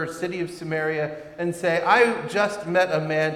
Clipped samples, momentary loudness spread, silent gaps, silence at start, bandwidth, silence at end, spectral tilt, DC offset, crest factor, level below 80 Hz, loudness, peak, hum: under 0.1%; 11 LU; none; 0 s; 14.5 kHz; 0 s; -5 dB/octave; under 0.1%; 18 dB; -62 dBFS; -23 LUFS; -6 dBFS; none